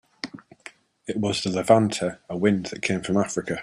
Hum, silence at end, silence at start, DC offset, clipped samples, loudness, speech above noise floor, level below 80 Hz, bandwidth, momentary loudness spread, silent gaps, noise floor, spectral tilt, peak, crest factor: none; 0 s; 0.25 s; under 0.1%; under 0.1%; -24 LUFS; 25 dB; -60 dBFS; 13.5 kHz; 21 LU; none; -48 dBFS; -5 dB/octave; -4 dBFS; 22 dB